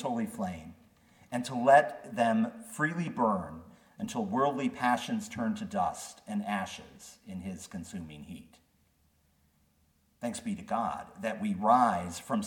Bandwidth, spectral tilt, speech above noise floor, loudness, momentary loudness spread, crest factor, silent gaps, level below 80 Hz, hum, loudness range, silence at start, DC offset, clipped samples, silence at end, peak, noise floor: 18 kHz; -5.5 dB/octave; 39 dB; -31 LUFS; 20 LU; 22 dB; none; -66 dBFS; none; 14 LU; 0 s; under 0.1%; under 0.1%; 0 s; -10 dBFS; -70 dBFS